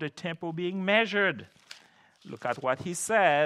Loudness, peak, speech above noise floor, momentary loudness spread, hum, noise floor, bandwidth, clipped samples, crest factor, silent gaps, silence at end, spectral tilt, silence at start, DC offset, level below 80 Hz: -28 LUFS; -8 dBFS; 31 dB; 24 LU; none; -59 dBFS; 13.5 kHz; under 0.1%; 20 dB; none; 0 s; -4 dB/octave; 0 s; under 0.1%; -74 dBFS